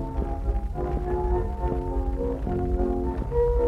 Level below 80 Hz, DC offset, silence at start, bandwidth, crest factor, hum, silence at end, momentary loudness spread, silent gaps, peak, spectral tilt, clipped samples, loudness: -28 dBFS; under 0.1%; 0 s; 4.2 kHz; 14 dB; none; 0 s; 4 LU; none; -12 dBFS; -10 dB/octave; under 0.1%; -28 LUFS